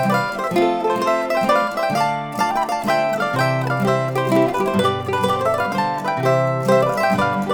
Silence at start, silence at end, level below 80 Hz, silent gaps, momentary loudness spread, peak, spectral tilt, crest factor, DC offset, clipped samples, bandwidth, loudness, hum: 0 s; 0 s; -52 dBFS; none; 3 LU; -2 dBFS; -6 dB/octave; 16 dB; under 0.1%; under 0.1%; over 20 kHz; -19 LUFS; none